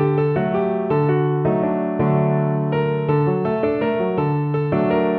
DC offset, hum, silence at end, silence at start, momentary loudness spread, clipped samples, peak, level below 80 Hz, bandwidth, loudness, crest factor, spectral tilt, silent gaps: under 0.1%; none; 0 s; 0 s; 2 LU; under 0.1%; -6 dBFS; -52 dBFS; 4.3 kHz; -20 LUFS; 12 dB; -11.5 dB/octave; none